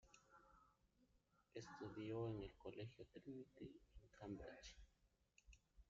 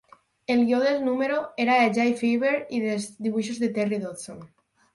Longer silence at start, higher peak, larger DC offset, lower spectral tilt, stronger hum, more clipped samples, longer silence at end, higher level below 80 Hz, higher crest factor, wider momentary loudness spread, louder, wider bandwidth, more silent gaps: second, 0.05 s vs 0.5 s; second, -38 dBFS vs -8 dBFS; neither; about the same, -6 dB/octave vs -5 dB/octave; neither; neither; second, 0.05 s vs 0.5 s; about the same, -72 dBFS vs -70 dBFS; about the same, 18 dB vs 16 dB; about the same, 12 LU vs 14 LU; second, -56 LUFS vs -24 LUFS; second, 7.4 kHz vs 11.5 kHz; neither